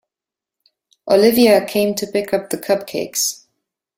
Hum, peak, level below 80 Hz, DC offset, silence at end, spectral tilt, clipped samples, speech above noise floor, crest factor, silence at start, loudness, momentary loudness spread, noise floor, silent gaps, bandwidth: none; -2 dBFS; -58 dBFS; under 0.1%; 0.65 s; -3.5 dB/octave; under 0.1%; 71 dB; 18 dB; 1.05 s; -17 LUFS; 10 LU; -87 dBFS; none; 16.5 kHz